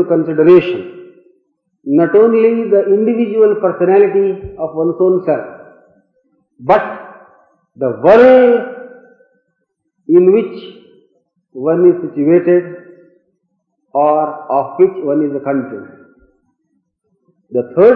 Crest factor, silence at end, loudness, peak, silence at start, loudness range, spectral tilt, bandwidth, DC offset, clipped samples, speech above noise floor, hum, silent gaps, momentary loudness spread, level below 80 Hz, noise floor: 14 dB; 0 s; -12 LUFS; 0 dBFS; 0 s; 6 LU; -9.5 dB/octave; 4.9 kHz; under 0.1%; under 0.1%; 57 dB; none; none; 17 LU; -54 dBFS; -68 dBFS